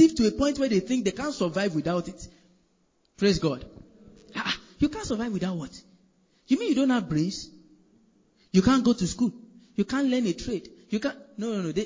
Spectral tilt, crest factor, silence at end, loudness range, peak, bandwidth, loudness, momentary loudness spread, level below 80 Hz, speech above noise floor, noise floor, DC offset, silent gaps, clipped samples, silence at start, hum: -5.5 dB/octave; 18 dB; 0 s; 4 LU; -8 dBFS; 7.6 kHz; -27 LUFS; 13 LU; -50 dBFS; 43 dB; -68 dBFS; under 0.1%; none; under 0.1%; 0 s; none